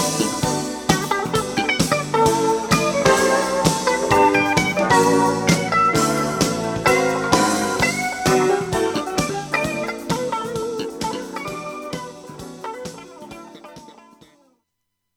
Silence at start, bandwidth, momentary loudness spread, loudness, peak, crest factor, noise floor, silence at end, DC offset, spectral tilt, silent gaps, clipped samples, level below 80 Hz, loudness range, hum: 0 s; 19 kHz; 16 LU; -19 LUFS; 0 dBFS; 20 dB; -76 dBFS; 1.25 s; under 0.1%; -4 dB/octave; none; under 0.1%; -46 dBFS; 14 LU; none